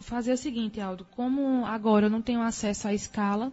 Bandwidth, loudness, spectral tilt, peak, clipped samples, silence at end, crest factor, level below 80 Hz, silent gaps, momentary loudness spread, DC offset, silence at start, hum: 8 kHz; -28 LUFS; -5.5 dB/octave; -10 dBFS; under 0.1%; 0 s; 18 dB; -54 dBFS; none; 9 LU; under 0.1%; 0 s; none